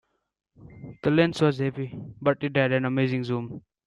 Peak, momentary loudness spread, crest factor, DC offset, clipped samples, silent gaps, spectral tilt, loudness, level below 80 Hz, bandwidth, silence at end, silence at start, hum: -8 dBFS; 14 LU; 18 dB; under 0.1%; under 0.1%; none; -7.5 dB/octave; -25 LUFS; -62 dBFS; 11 kHz; 0.25 s; 0.6 s; none